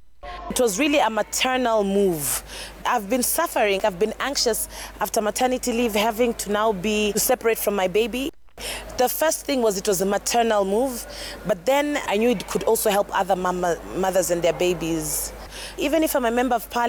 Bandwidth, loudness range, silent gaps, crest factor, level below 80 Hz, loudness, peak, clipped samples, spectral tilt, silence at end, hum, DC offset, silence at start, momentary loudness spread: over 20 kHz; 1 LU; none; 14 dB; -46 dBFS; -22 LUFS; -10 dBFS; under 0.1%; -3 dB/octave; 0 s; none; under 0.1%; 0 s; 9 LU